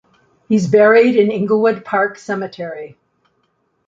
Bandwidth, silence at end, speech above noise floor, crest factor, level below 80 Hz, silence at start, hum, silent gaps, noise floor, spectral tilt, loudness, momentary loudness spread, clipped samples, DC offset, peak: 7.6 kHz; 1 s; 50 dB; 14 dB; -62 dBFS; 0.5 s; none; none; -65 dBFS; -6.5 dB/octave; -14 LUFS; 18 LU; under 0.1%; under 0.1%; -2 dBFS